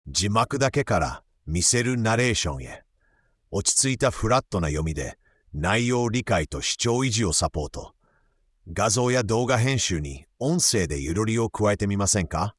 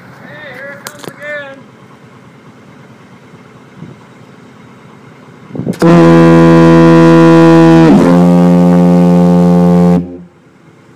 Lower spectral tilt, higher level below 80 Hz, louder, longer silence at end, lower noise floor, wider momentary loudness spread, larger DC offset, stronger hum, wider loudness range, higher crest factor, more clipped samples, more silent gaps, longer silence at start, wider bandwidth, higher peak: second, -4 dB/octave vs -8 dB/octave; about the same, -42 dBFS vs -40 dBFS; second, -23 LUFS vs -5 LUFS; second, 0.1 s vs 0.75 s; first, -65 dBFS vs -41 dBFS; second, 12 LU vs 22 LU; neither; neither; second, 2 LU vs 23 LU; first, 18 dB vs 8 dB; second, under 0.1% vs 2%; neither; second, 0.05 s vs 0.3 s; first, 12 kHz vs 9.8 kHz; second, -6 dBFS vs 0 dBFS